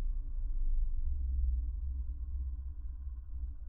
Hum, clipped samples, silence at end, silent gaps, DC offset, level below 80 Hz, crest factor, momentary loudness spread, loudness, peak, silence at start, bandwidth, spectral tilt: none; under 0.1%; 0 s; none; under 0.1%; -34 dBFS; 12 dB; 9 LU; -40 LUFS; -22 dBFS; 0 s; 1.1 kHz; -11.5 dB/octave